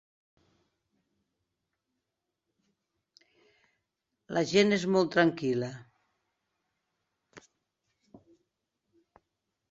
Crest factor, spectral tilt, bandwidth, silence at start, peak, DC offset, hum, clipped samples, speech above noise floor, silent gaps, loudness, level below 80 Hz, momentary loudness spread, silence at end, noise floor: 24 dB; -5.5 dB/octave; 8 kHz; 4.3 s; -10 dBFS; under 0.1%; none; under 0.1%; 59 dB; none; -27 LUFS; -74 dBFS; 12 LU; 2.3 s; -86 dBFS